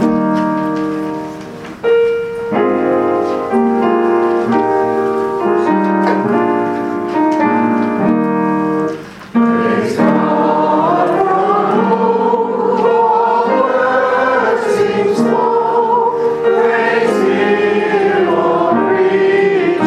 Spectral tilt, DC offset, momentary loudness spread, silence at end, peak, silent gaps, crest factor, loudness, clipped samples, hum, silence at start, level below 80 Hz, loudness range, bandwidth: -7 dB/octave; under 0.1%; 5 LU; 0 s; 0 dBFS; none; 12 dB; -13 LUFS; under 0.1%; none; 0 s; -54 dBFS; 2 LU; 12 kHz